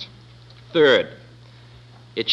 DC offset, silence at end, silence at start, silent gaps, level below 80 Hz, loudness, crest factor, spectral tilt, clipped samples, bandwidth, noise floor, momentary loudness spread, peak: under 0.1%; 0 s; 0 s; none; -58 dBFS; -18 LUFS; 18 dB; -5 dB/octave; under 0.1%; 7.8 kHz; -46 dBFS; 18 LU; -4 dBFS